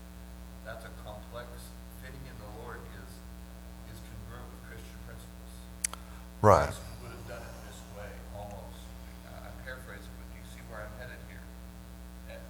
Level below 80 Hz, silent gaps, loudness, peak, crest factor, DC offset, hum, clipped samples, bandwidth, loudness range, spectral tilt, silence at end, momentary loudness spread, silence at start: -48 dBFS; none; -37 LUFS; -6 dBFS; 32 dB; under 0.1%; none; under 0.1%; over 20 kHz; 14 LU; -5 dB/octave; 0 s; 13 LU; 0 s